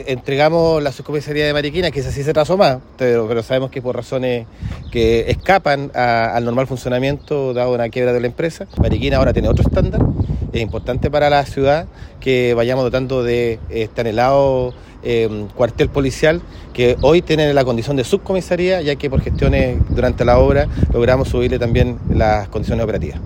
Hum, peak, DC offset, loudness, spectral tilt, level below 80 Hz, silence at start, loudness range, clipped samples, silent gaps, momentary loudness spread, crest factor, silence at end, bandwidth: none; 0 dBFS; under 0.1%; -17 LUFS; -7 dB/octave; -28 dBFS; 0 s; 2 LU; under 0.1%; none; 8 LU; 16 dB; 0 s; 16.5 kHz